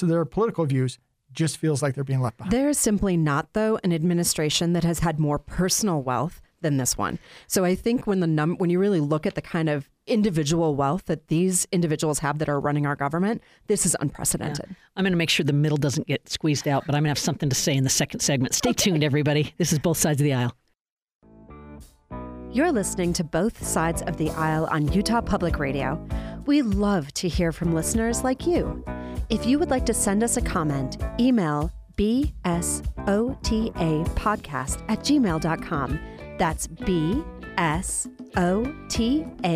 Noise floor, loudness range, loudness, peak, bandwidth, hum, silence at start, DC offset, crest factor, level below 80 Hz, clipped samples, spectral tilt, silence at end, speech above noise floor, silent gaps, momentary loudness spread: -46 dBFS; 3 LU; -24 LUFS; -8 dBFS; 15.5 kHz; none; 0 s; under 0.1%; 16 dB; -38 dBFS; under 0.1%; -5 dB/octave; 0 s; 22 dB; 20.92-20.97 s, 21.15-21.20 s; 7 LU